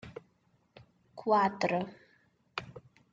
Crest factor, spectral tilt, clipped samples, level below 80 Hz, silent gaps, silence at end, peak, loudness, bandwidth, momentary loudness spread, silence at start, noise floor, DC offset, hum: 20 dB; -6 dB/octave; under 0.1%; -72 dBFS; none; 0.35 s; -16 dBFS; -32 LUFS; 7.8 kHz; 24 LU; 0.05 s; -71 dBFS; under 0.1%; none